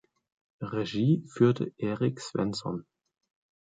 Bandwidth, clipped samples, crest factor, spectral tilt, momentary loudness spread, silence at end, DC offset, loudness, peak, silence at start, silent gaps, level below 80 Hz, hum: 9.4 kHz; under 0.1%; 20 dB; -7 dB/octave; 11 LU; 0.8 s; under 0.1%; -29 LUFS; -10 dBFS; 0.6 s; none; -66 dBFS; none